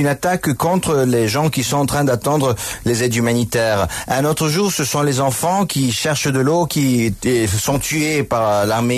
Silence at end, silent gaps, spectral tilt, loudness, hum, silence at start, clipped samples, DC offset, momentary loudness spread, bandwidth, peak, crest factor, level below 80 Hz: 0 s; none; -4.5 dB/octave; -17 LUFS; none; 0 s; under 0.1%; under 0.1%; 2 LU; 14 kHz; -4 dBFS; 12 dB; -42 dBFS